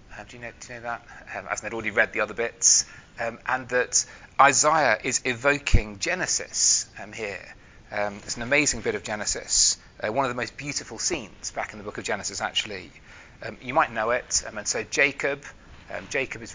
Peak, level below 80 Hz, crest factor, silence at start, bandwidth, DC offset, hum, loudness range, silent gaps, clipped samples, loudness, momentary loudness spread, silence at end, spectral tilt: -2 dBFS; -42 dBFS; 24 dB; 0.1 s; 7.8 kHz; under 0.1%; none; 7 LU; none; under 0.1%; -24 LUFS; 17 LU; 0 s; -1.5 dB/octave